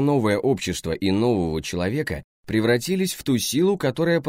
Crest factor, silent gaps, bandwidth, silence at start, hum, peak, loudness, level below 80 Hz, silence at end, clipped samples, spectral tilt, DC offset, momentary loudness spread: 14 dB; 2.24-2.44 s; 16 kHz; 0 s; none; -8 dBFS; -23 LUFS; -46 dBFS; 0 s; under 0.1%; -5.5 dB/octave; under 0.1%; 6 LU